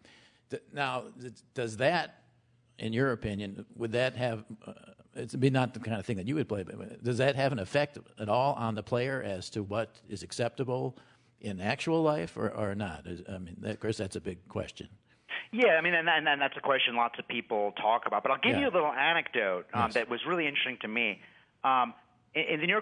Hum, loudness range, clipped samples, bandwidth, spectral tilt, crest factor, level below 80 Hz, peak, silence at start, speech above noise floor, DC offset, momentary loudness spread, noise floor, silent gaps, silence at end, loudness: none; 6 LU; under 0.1%; 11 kHz; -5.5 dB/octave; 20 dB; -66 dBFS; -12 dBFS; 0.5 s; 36 dB; under 0.1%; 15 LU; -67 dBFS; none; 0 s; -31 LUFS